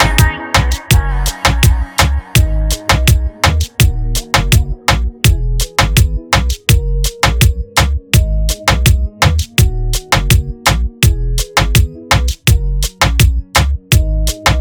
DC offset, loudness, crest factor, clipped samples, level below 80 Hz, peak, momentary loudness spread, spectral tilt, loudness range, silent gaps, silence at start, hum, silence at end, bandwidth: under 0.1%; -13 LUFS; 12 dB; under 0.1%; -16 dBFS; 0 dBFS; 3 LU; -4 dB/octave; 1 LU; none; 0 s; none; 0 s; over 20 kHz